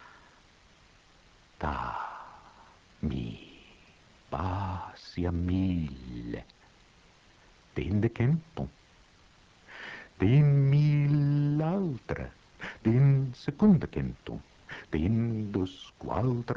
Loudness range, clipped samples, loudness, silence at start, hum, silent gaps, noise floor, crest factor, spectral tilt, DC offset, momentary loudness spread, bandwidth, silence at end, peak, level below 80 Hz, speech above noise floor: 12 LU; under 0.1%; -29 LUFS; 1.6 s; none; none; -60 dBFS; 18 dB; -9 dB/octave; under 0.1%; 19 LU; 6.6 kHz; 0 s; -12 dBFS; -50 dBFS; 32 dB